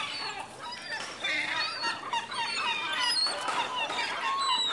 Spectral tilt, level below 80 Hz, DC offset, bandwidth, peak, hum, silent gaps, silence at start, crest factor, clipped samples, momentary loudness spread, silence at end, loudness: 0 dB/octave; -74 dBFS; under 0.1%; 11.5 kHz; -16 dBFS; none; none; 0 s; 16 dB; under 0.1%; 10 LU; 0 s; -30 LUFS